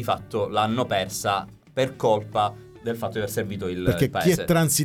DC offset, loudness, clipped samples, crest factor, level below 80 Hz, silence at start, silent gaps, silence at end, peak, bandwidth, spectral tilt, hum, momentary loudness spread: under 0.1%; -24 LUFS; under 0.1%; 16 dB; -50 dBFS; 0 s; none; 0 s; -8 dBFS; 18 kHz; -4.5 dB/octave; none; 8 LU